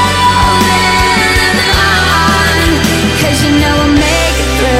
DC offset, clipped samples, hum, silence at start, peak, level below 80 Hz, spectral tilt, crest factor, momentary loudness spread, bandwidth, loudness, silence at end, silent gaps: under 0.1%; under 0.1%; none; 0 s; 0 dBFS; -20 dBFS; -4 dB/octave; 10 dB; 2 LU; 16.5 kHz; -9 LUFS; 0 s; none